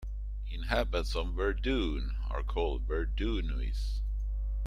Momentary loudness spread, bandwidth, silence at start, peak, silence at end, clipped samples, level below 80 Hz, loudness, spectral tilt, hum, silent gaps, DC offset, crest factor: 5 LU; 9.8 kHz; 0 s; -14 dBFS; 0 s; under 0.1%; -32 dBFS; -34 LUFS; -6.5 dB/octave; 50 Hz at -35 dBFS; none; under 0.1%; 18 dB